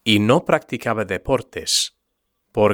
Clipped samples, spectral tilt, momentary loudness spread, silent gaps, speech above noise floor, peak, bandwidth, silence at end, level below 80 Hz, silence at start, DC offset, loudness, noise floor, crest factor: under 0.1%; -4 dB/octave; 8 LU; none; 54 dB; 0 dBFS; over 20 kHz; 0 s; -46 dBFS; 0.05 s; under 0.1%; -20 LUFS; -73 dBFS; 20 dB